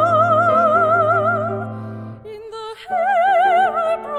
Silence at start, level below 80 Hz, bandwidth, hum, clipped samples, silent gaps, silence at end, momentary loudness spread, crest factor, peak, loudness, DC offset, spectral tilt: 0 s; -58 dBFS; 10.5 kHz; none; under 0.1%; none; 0 s; 18 LU; 14 dB; -4 dBFS; -16 LUFS; under 0.1%; -6.5 dB/octave